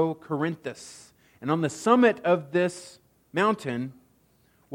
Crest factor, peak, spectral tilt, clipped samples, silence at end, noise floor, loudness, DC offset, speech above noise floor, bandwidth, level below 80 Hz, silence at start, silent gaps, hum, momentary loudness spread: 20 dB; -6 dBFS; -6 dB/octave; under 0.1%; 0 s; -64 dBFS; -26 LUFS; under 0.1%; 38 dB; 16.5 kHz; -72 dBFS; 0 s; none; none; 18 LU